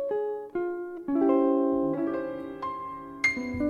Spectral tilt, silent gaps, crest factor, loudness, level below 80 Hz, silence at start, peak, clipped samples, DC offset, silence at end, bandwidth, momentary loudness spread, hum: -6 dB/octave; none; 16 dB; -28 LUFS; -58 dBFS; 0 s; -12 dBFS; under 0.1%; under 0.1%; 0 s; 9.4 kHz; 12 LU; none